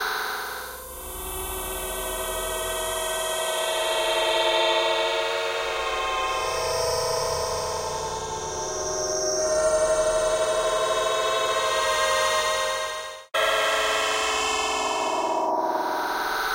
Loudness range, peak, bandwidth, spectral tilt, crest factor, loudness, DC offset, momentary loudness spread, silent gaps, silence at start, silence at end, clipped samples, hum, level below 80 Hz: 4 LU; -10 dBFS; 16 kHz; -1 dB/octave; 16 dB; -24 LUFS; under 0.1%; 8 LU; none; 0 s; 0 s; under 0.1%; none; -46 dBFS